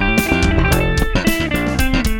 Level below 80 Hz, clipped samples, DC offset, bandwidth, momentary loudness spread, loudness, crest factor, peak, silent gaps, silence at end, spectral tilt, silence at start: -20 dBFS; under 0.1%; under 0.1%; 17.5 kHz; 3 LU; -16 LUFS; 14 dB; 0 dBFS; none; 0 s; -5 dB/octave; 0 s